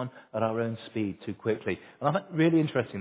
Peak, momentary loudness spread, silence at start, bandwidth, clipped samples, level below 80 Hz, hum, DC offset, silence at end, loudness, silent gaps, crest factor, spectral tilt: -12 dBFS; 10 LU; 0 s; 4 kHz; under 0.1%; -64 dBFS; none; under 0.1%; 0 s; -29 LUFS; none; 18 dB; -6.5 dB/octave